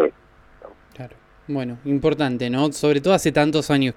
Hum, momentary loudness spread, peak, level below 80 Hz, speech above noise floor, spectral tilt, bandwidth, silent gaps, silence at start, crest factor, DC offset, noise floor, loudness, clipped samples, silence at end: none; 22 LU; -4 dBFS; -50 dBFS; 31 dB; -5.5 dB/octave; 15 kHz; none; 0 s; 18 dB; under 0.1%; -51 dBFS; -20 LUFS; under 0.1%; 0.05 s